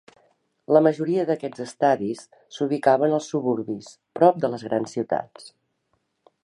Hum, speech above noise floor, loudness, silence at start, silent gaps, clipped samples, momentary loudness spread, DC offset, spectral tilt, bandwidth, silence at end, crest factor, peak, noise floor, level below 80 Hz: none; 50 dB; -23 LUFS; 0.7 s; none; under 0.1%; 14 LU; under 0.1%; -6.5 dB/octave; 11 kHz; 0.95 s; 22 dB; -2 dBFS; -72 dBFS; -72 dBFS